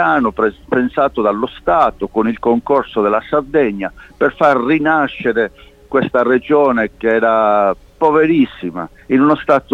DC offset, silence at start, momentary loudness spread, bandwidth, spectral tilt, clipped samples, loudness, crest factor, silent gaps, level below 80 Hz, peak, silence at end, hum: under 0.1%; 0 s; 6 LU; 7.4 kHz; -7.5 dB/octave; under 0.1%; -15 LUFS; 14 dB; none; -44 dBFS; 0 dBFS; 0 s; none